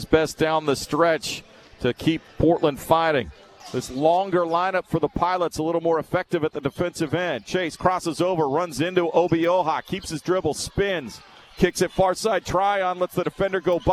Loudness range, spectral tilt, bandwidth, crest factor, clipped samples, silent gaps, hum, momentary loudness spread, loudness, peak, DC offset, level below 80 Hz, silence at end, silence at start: 2 LU; -5 dB/octave; 14 kHz; 20 dB; under 0.1%; none; none; 7 LU; -23 LUFS; -2 dBFS; under 0.1%; -46 dBFS; 0 s; 0 s